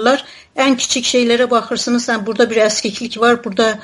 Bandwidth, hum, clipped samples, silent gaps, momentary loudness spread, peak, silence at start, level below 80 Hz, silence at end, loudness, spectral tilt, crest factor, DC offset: 11.5 kHz; none; under 0.1%; none; 5 LU; 0 dBFS; 0 s; -56 dBFS; 0 s; -15 LUFS; -2.5 dB/octave; 14 dB; under 0.1%